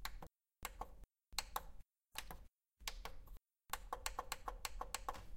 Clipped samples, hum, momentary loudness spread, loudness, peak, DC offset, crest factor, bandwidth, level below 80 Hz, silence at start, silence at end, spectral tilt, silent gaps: under 0.1%; none; 18 LU; -49 LUFS; -20 dBFS; under 0.1%; 30 dB; 16.5 kHz; -56 dBFS; 0 s; 0 s; -1 dB/octave; none